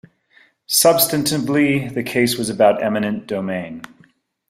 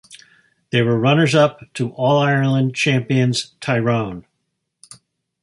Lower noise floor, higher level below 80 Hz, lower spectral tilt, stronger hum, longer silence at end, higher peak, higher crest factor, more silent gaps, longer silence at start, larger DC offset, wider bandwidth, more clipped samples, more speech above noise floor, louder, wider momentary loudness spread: second, -55 dBFS vs -74 dBFS; about the same, -56 dBFS vs -56 dBFS; second, -4 dB/octave vs -6 dB/octave; neither; second, 0.65 s vs 1.25 s; about the same, 0 dBFS vs -2 dBFS; about the same, 18 dB vs 18 dB; neither; first, 0.7 s vs 0.1 s; neither; first, 16 kHz vs 11.5 kHz; neither; second, 37 dB vs 57 dB; about the same, -17 LUFS vs -18 LUFS; first, 12 LU vs 9 LU